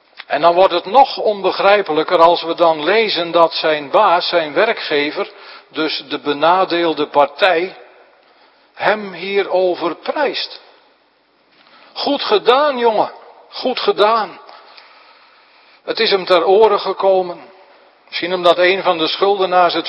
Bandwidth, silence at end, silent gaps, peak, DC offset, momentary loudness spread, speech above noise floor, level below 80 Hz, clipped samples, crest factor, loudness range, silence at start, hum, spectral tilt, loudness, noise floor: 8.2 kHz; 0 s; none; 0 dBFS; under 0.1%; 11 LU; 42 dB; -64 dBFS; under 0.1%; 16 dB; 7 LU; 0.3 s; none; -5.5 dB/octave; -15 LUFS; -56 dBFS